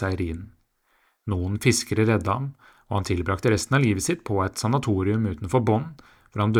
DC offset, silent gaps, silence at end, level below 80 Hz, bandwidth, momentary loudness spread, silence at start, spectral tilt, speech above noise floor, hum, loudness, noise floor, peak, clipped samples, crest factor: under 0.1%; none; 0 s; -50 dBFS; 16.5 kHz; 10 LU; 0 s; -5.5 dB/octave; 43 dB; none; -24 LUFS; -66 dBFS; -6 dBFS; under 0.1%; 18 dB